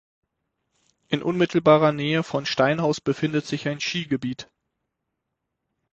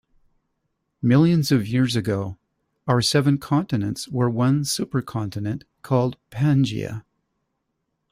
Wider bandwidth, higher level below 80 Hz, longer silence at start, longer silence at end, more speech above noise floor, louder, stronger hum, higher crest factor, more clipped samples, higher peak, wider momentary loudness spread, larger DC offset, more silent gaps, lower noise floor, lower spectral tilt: second, 8.4 kHz vs 15.5 kHz; second, -62 dBFS vs -56 dBFS; about the same, 1.1 s vs 1.05 s; first, 1.5 s vs 1.1 s; about the same, 58 dB vs 55 dB; about the same, -23 LUFS vs -22 LUFS; neither; about the same, 22 dB vs 18 dB; neither; about the same, -4 dBFS vs -6 dBFS; about the same, 11 LU vs 12 LU; neither; neither; first, -81 dBFS vs -76 dBFS; about the same, -6 dB/octave vs -6 dB/octave